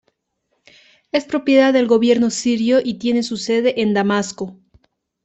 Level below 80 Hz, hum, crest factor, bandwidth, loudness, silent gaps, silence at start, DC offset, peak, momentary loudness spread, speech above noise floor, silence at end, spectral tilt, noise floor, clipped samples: -60 dBFS; none; 16 dB; 8.4 kHz; -17 LUFS; none; 1.15 s; under 0.1%; -2 dBFS; 9 LU; 54 dB; 0.7 s; -4.5 dB/octave; -71 dBFS; under 0.1%